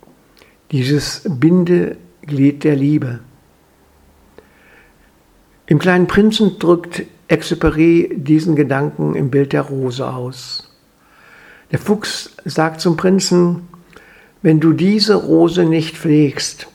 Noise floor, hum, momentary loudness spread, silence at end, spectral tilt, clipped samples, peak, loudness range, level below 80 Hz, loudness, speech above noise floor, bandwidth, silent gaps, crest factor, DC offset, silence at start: -51 dBFS; none; 12 LU; 0.1 s; -6 dB/octave; under 0.1%; 0 dBFS; 7 LU; -42 dBFS; -15 LUFS; 37 dB; 14.5 kHz; none; 16 dB; under 0.1%; 0.7 s